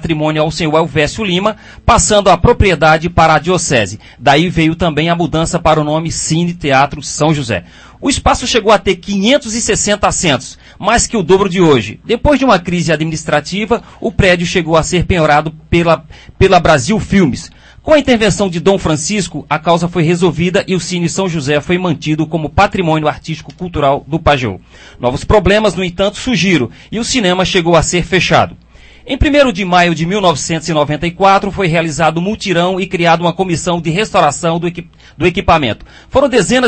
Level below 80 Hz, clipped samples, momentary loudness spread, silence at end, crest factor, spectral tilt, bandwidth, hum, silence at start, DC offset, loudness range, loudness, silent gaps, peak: -30 dBFS; 0.2%; 7 LU; 0 s; 12 dB; -4.5 dB/octave; 8.8 kHz; none; 0 s; under 0.1%; 3 LU; -12 LUFS; none; 0 dBFS